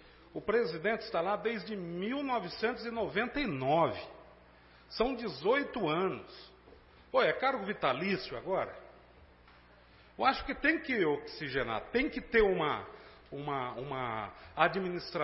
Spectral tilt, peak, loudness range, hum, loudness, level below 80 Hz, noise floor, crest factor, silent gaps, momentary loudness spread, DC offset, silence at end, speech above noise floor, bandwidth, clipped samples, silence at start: -9 dB/octave; -10 dBFS; 3 LU; 60 Hz at -65 dBFS; -33 LUFS; -56 dBFS; -59 dBFS; 24 dB; none; 13 LU; under 0.1%; 0 s; 27 dB; 5.8 kHz; under 0.1%; 0.05 s